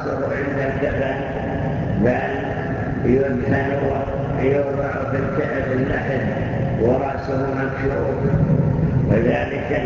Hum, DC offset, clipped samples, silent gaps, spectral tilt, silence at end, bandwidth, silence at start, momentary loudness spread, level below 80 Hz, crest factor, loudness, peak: none; under 0.1%; under 0.1%; none; -9 dB/octave; 0 s; 7.2 kHz; 0 s; 5 LU; -34 dBFS; 16 dB; -21 LUFS; -4 dBFS